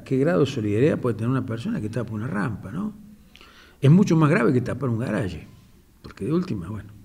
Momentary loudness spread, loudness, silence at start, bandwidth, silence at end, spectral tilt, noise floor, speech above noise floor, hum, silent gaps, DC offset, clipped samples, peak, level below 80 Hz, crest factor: 14 LU; -23 LUFS; 0 s; 12.5 kHz; 0.05 s; -8 dB/octave; -52 dBFS; 30 dB; none; none; under 0.1%; under 0.1%; -6 dBFS; -52 dBFS; 18 dB